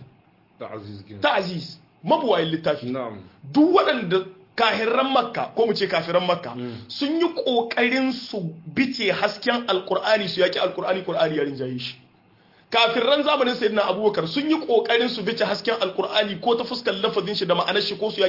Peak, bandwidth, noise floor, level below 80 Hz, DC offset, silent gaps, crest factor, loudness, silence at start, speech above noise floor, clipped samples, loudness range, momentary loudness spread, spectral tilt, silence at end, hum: -4 dBFS; 5.8 kHz; -57 dBFS; -68 dBFS; under 0.1%; none; 18 dB; -22 LUFS; 0 s; 34 dB; under 0.1%; 3 LU; 12 LU; -5.5 dB/octave; 0 s; none